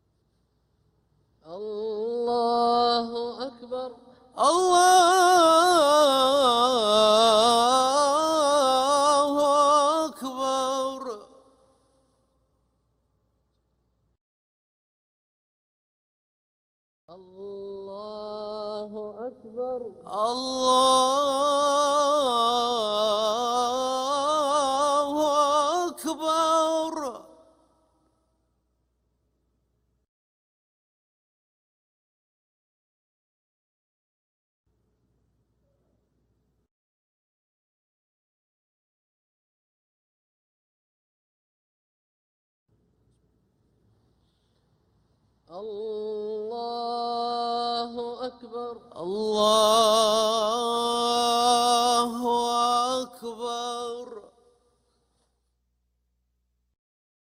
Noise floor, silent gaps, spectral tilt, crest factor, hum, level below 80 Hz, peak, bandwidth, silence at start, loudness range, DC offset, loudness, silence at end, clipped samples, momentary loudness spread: -75 dBFS; 14.21-17.08 s, 30.08-34.64 s, 36.71-42.66 s; -2 dB/octave; 20 dB; none; -68 dBFS; -8 dBFS; 16 kHz; 1.45 s; 18 LU; under 0.1%; -23 LUFS; 3.1 s; under 0.1%; 18 LU